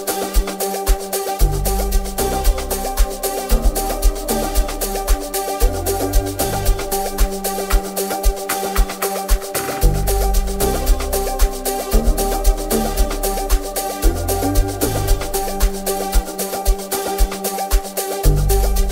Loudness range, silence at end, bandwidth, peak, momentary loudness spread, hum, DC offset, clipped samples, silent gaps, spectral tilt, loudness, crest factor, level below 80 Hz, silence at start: 1 LU; 0 s; 16.5 kHz; -2 dBFS; 3 LU; none; under 0.1%; under 0.1%; none; -4 dB/octave; -20 LUFS; 16 dB; -20 dBFS; 0 s